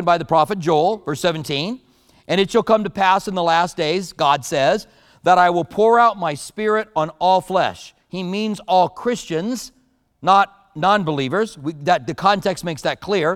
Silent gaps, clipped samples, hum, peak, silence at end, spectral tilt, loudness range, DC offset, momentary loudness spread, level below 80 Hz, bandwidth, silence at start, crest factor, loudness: none; under 0.1%; none; 0 dBFS; 0 s; -5 dB/octave; 3 LU; under 0.1%; 9 LU; -54 dBFS; 15.5 kHz; 0 s; 18 dB; -19 LUFS